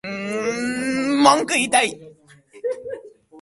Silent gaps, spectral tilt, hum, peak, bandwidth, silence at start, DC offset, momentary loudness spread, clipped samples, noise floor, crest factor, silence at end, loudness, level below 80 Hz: none; -2.5 dB/octave; none; 0 dBFS; 11.5 kHz; 0.05 s; under 0.1%; 17 LU; under 0.1%; -49 dBFS; 22 dB; 0 s; -20 LUFS; -62 dBFS